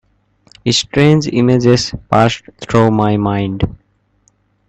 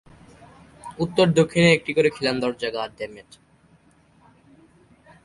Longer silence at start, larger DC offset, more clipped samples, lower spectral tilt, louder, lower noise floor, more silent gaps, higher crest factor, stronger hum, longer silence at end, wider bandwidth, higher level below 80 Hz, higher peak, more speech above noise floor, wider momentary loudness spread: second, 0.65 s vs 0.85 s; neither; neither; about the same, -6 dB/octave vs -5.5 dB/octave; first, -13 LUFS vs -21 LUFS; about the same, -57 dBFS vs -57 dBFS; neither; second, 14 dB vs 22 dB; first, 50 Hz at -40 dBFS vs none; second, 0.95 s vs 2.05 s; second, 8.8 kHz vs 11.5 kHz; first, -38 dBFS vs -56 dBFS; first, 0 dBFS vs -4 dBFS; first, 45 dB vs 36 dB; second, 9 LU vs 18 LU